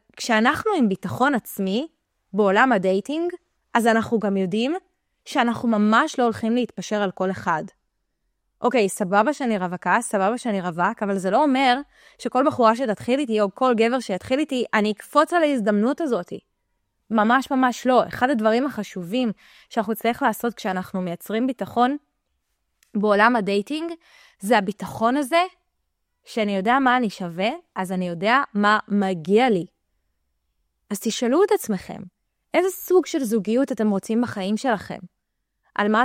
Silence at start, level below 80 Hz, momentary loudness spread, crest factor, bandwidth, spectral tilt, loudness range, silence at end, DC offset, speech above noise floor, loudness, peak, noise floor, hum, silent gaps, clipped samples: 0.15 s; -64 dBFS; 10 LU; 20 dB; 16 kHz; -5 dB/octave; 3 LU; 0 s; under 0.1%; 56 dB; -22 LUFS; -4 dBFS; -77 dBFS; none; none; under 0.1%